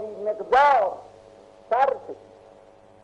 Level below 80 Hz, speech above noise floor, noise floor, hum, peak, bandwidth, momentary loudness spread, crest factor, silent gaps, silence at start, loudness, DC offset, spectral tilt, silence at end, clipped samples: -62 dBFS; 30 dB; -52 dBFS; 50 Hz at -65 dBFS; -8 dBFS; 9.2 kHz; 23 LU; 16 dB; none; 0 s; -22 LUFS; under 0.1%; -4 dB/octave; 0.9 s; under 0.1%